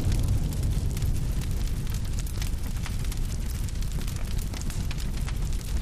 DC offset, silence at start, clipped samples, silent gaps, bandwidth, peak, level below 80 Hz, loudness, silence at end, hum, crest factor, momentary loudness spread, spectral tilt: under 0.1%; 0 s; under 0.1%; none; 15.5 kHz; -14 dBFS; -28 dBFS; -31 LUFS; 0 s; none; 14 dB; 5 LU; -5.5 dB/octave